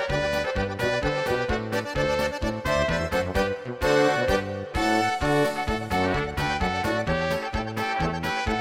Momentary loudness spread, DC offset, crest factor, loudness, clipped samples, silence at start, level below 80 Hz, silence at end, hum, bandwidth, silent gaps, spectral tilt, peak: 5 LU; under 0.1%; 16 dB; -25 LUFS; under 0.1%; 0 s; -38 dBFS; 0 s; none; 16.5 kHz; none; -5 dB/octave; -8 dBFS